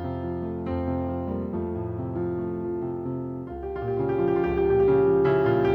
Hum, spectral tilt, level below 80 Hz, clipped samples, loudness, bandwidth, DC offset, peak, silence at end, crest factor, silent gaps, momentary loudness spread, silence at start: none; -10.5 dB/octave; -44 dBFS; under 0.1%; -26 LUFS; 4.9 kHz; under 0.1%; -12 dBFS; 0 s; 14 dB; none; 11 LU; 0 s